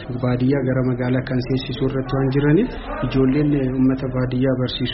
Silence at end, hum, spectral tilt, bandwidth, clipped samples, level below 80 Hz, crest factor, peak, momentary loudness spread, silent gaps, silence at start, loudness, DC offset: 0 s; none; -6.5 dB/octave; 5.8 kHz; under 0.1%; -36 dBFS; 14 dB; -4 dBFS; 5 LU; none; 0 s; -20 LUFS; under 0.1%